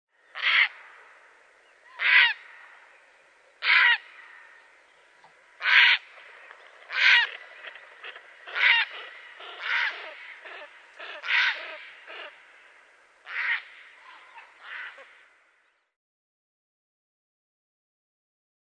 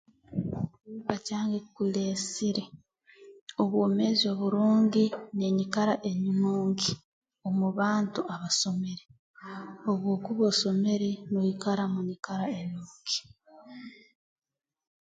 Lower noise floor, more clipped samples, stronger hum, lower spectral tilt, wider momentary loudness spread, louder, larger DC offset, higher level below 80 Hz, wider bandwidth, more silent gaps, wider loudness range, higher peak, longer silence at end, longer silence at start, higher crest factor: first, -68 dBFS vs -56 dBFS; neither; neither; second, 3.5 dB/octave vs -5 dB/octave; first, 24 LU vs 15 LU; first, -22 LUFS vs -29 LUFS; neither; second, under -90 dBFS vs -66 dBFS; about the same, 9.6 kHz vs 9.4 kHz; second, none vs 3.41-3.47 s, 7.05-7.22 s, 9.19-9.34 s; first, 13 LU vs 6 LU; first, -4 dBFS vs -10 dBFS; first, 3.7 s vs 1.1 s; about the same, 0.35 s vs 0.3 s; about the same, 24 dB vs 20 dB